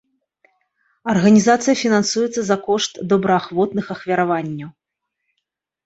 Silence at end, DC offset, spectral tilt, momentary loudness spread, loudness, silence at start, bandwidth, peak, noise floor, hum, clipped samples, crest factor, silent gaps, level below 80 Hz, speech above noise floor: 1.15 s; under 0.1%; -5 dB/octave; 12 LU; -18 LUFS; 1.05 s; 8.2 kHz; -2 dBFS; -78 dBFS; none; under 0.1%; 18 dB; none; -60 dBFS; 60 dB